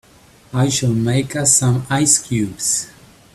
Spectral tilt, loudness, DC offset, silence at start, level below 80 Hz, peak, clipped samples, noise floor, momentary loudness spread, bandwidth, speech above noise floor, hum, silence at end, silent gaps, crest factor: -4 dB/octave; -16 LUFS; under 0.1%; 0.5 s; -48 dBFS; 0 dBFS; under 0.1%; -48 dBFS; 8 LU; 14 kHz; 31 dB; none; 0.45 s; none; 18 dB